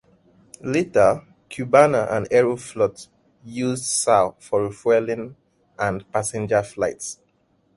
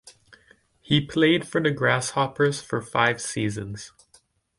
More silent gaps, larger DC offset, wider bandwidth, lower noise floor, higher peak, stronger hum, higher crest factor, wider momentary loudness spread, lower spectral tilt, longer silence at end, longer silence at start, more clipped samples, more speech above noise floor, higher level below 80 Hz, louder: neither; neither; about the same, 11.5 kHz vs 11.5 kHz; about the same, -64 dBFS vs -61 dBFS; first, 0 dBFS vs -4 dBFS; neither; about the same, 22 dB vs 20 dB; about the same, 15 LU vs 13 LU; about the same, -4.5 dB/octave vs -4.5 dB/octave; about the same, 0.65 s vs 0.7 s; first, 0.65 s vs 0.05 s; neither; first, 43 dB vs 37 dB; about the same, -56 dBFS vs -58 dBFS; about the same, -21 LUFS vs -23 LUFS